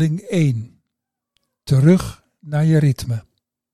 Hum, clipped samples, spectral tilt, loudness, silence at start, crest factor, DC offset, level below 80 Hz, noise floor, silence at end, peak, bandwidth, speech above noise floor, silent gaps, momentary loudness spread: none; under 0.1%; -7.5 dB/octave; -18 LUFS; 0 s; 16 dB; under 0.1%; -46 dBFS; -81 dBFS; 0.55 s; -4 dBFS; 13 kHz; 64 dB; none; 16 LU